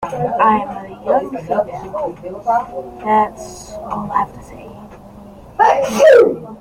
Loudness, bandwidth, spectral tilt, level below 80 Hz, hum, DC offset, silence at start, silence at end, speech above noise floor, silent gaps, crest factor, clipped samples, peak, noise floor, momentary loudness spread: -16 LUFS; 16 kHz; -5 dB/octave; -46 dBFS; none; under 0.1%; 0 s; 0 s; 22 dB; none; 16 dB; under 0.1%; 0 dBFS; -38 dBFS; 21 LU